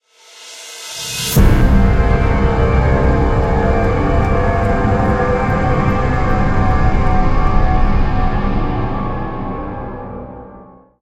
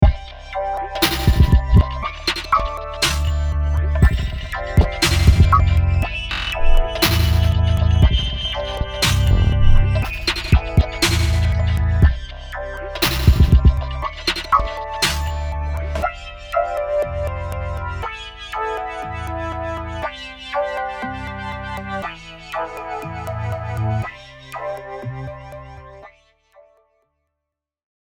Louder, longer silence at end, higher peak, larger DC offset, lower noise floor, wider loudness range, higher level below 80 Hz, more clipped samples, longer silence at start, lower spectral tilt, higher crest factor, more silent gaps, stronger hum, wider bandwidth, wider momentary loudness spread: first, -16 LUFS vs -20 LUFS; second, 0.4 s vs 1.95 s; about the same, 0 dBFS vs 0 dBFS; neither; second, -40 dBFS vs -82 dBFS; second, 5 LU vs 10 LU; about the same, -18 dBFS vs -22 dBFS; neither; first, 0.4 s vs 0 s; first, -6.5 dB/octave vs -5 dB/octave; about the same, 14 dB vs 18 dB; neither; neither; second, 16.5 kHz vs over 20 kHz; about the same, 14 LU vs 14 LU